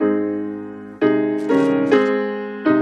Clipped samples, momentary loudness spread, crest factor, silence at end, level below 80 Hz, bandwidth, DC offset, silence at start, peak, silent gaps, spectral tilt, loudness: under 0.1%; 11 LU; 16 dB; 0 s; -66 dBFS; 8.4 kHz; under 0.1%; 0 s; -2 dBFS; none; -7.5 dB/octave; -19 LUFS